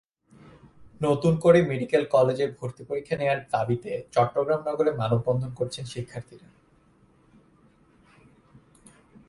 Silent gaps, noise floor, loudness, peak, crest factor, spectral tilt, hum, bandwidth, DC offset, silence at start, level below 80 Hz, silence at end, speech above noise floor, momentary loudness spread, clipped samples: none; -60 dBFS; -25 LUFS; -4 dBFS; 22 dB; -7 dB/octave; none; 11.5 kHz; under 0.1%; 0.8 s; -58 dBFS; 2.9 s; 36 dB; 14 LU; under 0.1%